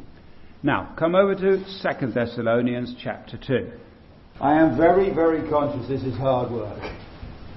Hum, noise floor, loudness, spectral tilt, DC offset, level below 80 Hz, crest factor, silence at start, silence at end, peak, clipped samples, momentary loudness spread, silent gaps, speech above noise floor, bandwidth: none; -47 dBFS; -22 LUFS; -9.5 dB/octave; under 0.1%; -48 dBFS; 18 dB; 0 s; 0 s; -6 dBFS; under 0.1%; 16 LU; none; 25 dB; 6 kHz